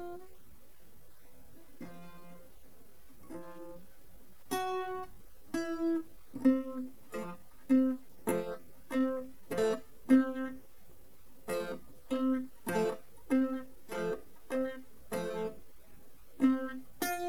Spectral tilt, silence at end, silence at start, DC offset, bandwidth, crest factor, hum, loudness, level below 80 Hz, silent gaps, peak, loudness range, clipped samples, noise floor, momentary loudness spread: -5.5 dB/octave; 0 s; 0 s; 0.5%; 19 kHz; 22 dB; none; -35 LUFS; -64 dBFS; none; -14 dBFS; 13 LU; under 0.1%; -61 dBFS; 21 LU